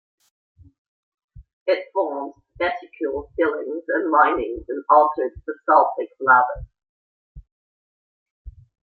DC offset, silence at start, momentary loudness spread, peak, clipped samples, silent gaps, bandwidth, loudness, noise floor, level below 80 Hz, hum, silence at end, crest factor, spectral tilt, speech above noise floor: under 0.1%; 1.35 s; 13 LU; -2 dBFS; under 0.1%; 1.53-1.66 s, 6.89-7.35 s, 7.52-8.45 s; 4.7 kHz; -21 LUFS; under -90 dBFS; -50 dBFS; none; 0.35 s; 20 dB; -7.5 dB/octave; over 70 dB